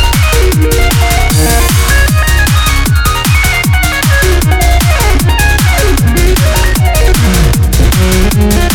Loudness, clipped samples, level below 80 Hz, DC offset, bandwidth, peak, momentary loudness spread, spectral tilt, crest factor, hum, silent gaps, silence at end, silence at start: -9 LUFS; under 0.1%; -10 dBFS; under 0.1%; 19 kHz; 0 dBFS; 1 LU; -4.5 dB/octave; 8 dB; none; none; 0 s; 0 s